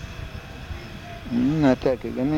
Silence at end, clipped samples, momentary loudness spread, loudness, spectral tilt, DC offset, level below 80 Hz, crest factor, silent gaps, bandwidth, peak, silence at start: 0 s; under 0.1%; 17 LU; -22 LUFS; -7.5 dB/octave; under 0.1%; -42 dBFS; 18 dB; none; 15.5 kHz; -6 dBFS; 0 s